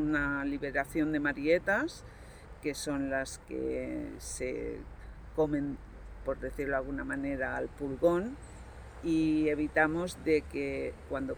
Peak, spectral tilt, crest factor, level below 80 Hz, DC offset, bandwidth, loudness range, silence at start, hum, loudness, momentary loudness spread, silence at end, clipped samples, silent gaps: -14 dBFS; -5.5 dB/octave; 20 dB; -50 dBFS; under 0.1%; over 20 kHz; 6 LU; 0 s; none; -33 LUFS; 17 LU; 0 s; under 0.1%; none